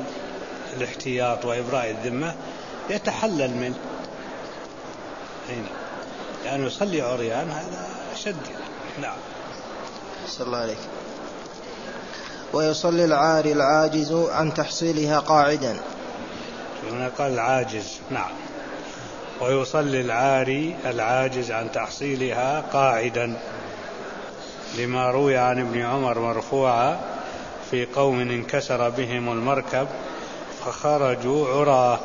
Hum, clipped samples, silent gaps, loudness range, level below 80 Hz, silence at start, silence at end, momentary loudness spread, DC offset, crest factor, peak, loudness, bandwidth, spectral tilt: none; under 0.1%; none; 10 LU; -56 dBFS; 0 s; 0 s; 16 LU; 0.3%; 20 dB; -4 dBFS; -24 LUFS; 7.4 kHz; -5 dB/octave